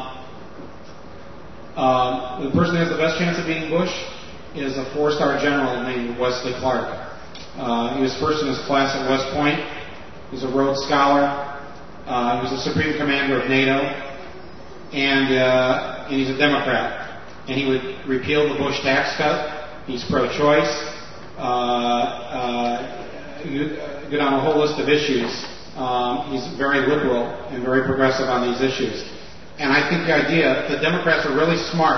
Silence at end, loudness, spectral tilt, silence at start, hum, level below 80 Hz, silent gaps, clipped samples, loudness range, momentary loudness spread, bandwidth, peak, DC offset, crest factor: 0 s; -21 LUFS; -5 dB/octave; 0 s; none; -50 dBFS; none; under 0.1%; 3 LU; 18 LU; 6.4 kHz; -2 dBFS; 1%; 20 dB